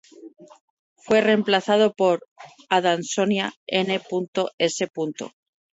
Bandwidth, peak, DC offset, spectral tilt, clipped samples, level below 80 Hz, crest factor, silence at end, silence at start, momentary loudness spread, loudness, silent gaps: 8 kHz; -4 dBFS; under 0.1%; -4 dB/octave; under 0.1%; -70 dBFS; 18 dB; 0.45 s; 0.2 s; 9 LU; -22 LUFS; 0.61-0.96 s, 2.31-2.36 s, 3.56-3.67 s, 4.28-4.33 s, 4.54-4.58 s